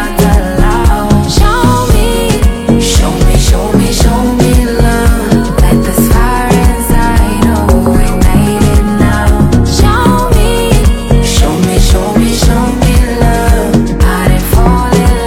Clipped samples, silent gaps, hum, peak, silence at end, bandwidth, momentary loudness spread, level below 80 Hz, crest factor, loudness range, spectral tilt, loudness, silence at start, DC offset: 0.8%; none; none; 0 dBFS; 0 s; 17 kHz; 2 LU; -10 dBFS; 8 dB; 1 LU; -5.5 dB/octave; -9 LUFS; 0 s; under 0.1%